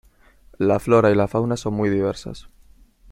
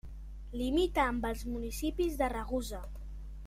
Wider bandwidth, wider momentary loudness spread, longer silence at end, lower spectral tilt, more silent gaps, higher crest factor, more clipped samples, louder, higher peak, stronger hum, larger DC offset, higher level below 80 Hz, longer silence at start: about the same, 16.5 kHz vs 16 kHz; about the same, 17 LU vs 17 LU; first, 0.7 s vs 0 s; first, -7 dB/octave vs -5 dB/octave; neither; about the same, 18 dB vs 18 dB; neither; first, -20 LUFS vs -34 LUFS; first, -2 dBFS vs -16 dBFS; second, none vs 50 Hz at -40 dBFS; neither; second, -48 dBFS vs -42 dBFS; first, 0.6 s vs 0.05 s